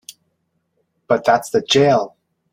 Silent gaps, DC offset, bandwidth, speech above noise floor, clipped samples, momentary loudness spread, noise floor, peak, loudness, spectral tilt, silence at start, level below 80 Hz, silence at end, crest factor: none; under 0.1%; 16 kHz; 54 dB; under 0.1%; 7 LU; -69 dBFS; -2 dBFS; -16 LUFS; -4.5 dB/octave; 1.1 s; -62 dBFS; 0.45 s; 18 dB